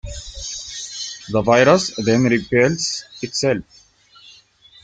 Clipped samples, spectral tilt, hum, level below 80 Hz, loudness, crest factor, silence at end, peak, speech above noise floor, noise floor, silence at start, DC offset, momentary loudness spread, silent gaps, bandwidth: under 0.1%; -4.5 dB/octave; none; -44 dBFS; -18 LUFS; 18 dB; 0.55 s; -2 dBFS; 32 dB; -49 dBFS; 0.05 s; under 0.1%; 15 LU; none; 9.6 kHz